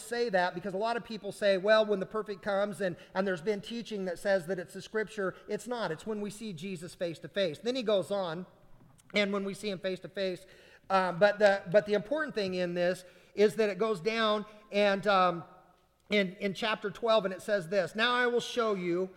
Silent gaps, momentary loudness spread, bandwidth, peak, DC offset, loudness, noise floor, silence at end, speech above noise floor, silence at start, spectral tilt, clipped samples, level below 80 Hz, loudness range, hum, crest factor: none; 11 LU; 16 kHz; -12 dBFS; under 0.1%; -31 LUFS; -64 dBFS; 0.05 s; 34 dB; 0 s; -5 dB/octave; under 0.1%; -68 dBFS; 6 LU; none; 20 dB